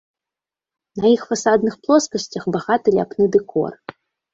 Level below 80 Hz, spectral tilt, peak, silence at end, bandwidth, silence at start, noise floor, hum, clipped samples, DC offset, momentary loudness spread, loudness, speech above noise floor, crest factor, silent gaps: -58 dBFS; -5 dB/octave; -2 dBFS; 0.6 s; 8 kHz; 0.95 s; -88 dBFS; none; under 0.1%; under 0.1%; 10 LU; -19 LUFS; 70 dB; 18 dB; none